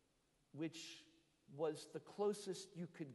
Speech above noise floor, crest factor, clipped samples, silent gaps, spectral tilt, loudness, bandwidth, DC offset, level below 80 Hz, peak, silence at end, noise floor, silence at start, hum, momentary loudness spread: 34 dB; 18 dB; under 0.1%; none; -5 dB/octave; -47 LUFS; 11.5 kHz; under 0.1%; -90 dBFS; -30 dBFS; 0 s; -80 dBFS; 0.55 s; none; 16 LU